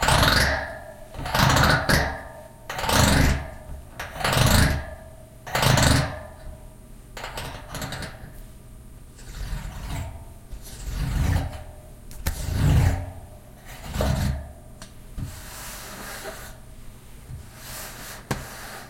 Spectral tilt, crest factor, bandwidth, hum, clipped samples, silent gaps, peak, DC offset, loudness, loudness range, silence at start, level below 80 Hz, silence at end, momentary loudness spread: -4 dB/octave; 24 dB; 17 kHz; none; under 0.1%; none; -2 dBFS; under 0.1%; -24 LUFS; 15 LU; 0 s; -32 dBFS; 0 s; 25 LU